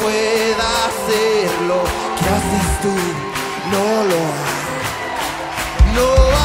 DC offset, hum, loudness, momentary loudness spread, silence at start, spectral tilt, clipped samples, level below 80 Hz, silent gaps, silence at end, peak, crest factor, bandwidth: under 0.1%; none; -17 LUFS; 7 LU; 0 s; -4.5 dB/octave; under 0.1%; -24 dBFS; none; 0 s; 0 dBFS; 16 dB; 16.5 kHz